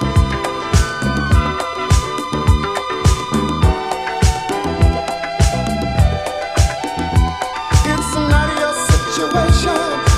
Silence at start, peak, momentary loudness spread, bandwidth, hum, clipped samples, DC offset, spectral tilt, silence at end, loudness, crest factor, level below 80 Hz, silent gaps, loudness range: 0 s; 0 dBFS; 5 LU; 15 kHz; none; under 0.1%; under 0.1%; -5 dB/octave; 0 s; -17 LUFS; 14 dB; -20 dBFS; none; 1 LU